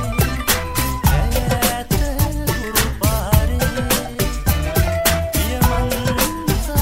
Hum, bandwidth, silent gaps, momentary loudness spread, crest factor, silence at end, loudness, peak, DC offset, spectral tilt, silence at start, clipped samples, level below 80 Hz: none; 16.5 kHz; none; 4 LU; 18 dB; 0 s; -18 LUFS; 0 dBFS; under 0.1%; -4.5 dB/octave; 0 s; under 0.1%; -22 dBFS